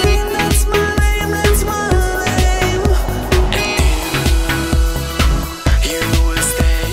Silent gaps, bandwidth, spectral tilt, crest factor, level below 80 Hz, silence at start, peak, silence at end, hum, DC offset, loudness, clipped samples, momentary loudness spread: none; 16.5 kHz; -4.5 dB/octave; 12 dB; -16 dBFS; 0 s; -2 dBFS; 0 s; none; under 0.1%; -16 LUFS; under 0.1%; 2 LU